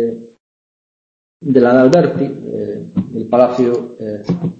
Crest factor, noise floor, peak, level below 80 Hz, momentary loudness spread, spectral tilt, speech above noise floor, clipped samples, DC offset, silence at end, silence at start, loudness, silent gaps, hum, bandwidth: 16 dB; under -90 dBFS; 0 dBFS; -54 dBFS; 15 LU; -8 dB/octave; over 77 dB; under 0.1%; under 0.1%; 0.05 s; 0 s; -14 LUFS; 0.40-1.40 s; none; 7.8 kHz